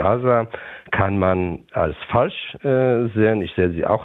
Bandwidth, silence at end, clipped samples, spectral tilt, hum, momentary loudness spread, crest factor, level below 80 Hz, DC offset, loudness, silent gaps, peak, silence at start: 4.1 kHz; 0 s; under 0.1%; -10 dB/octave; none; 7 LU; 16 dB; -48 dBFS; under 0.1%; -20 LUFS; none; -4 dBFS; 0 s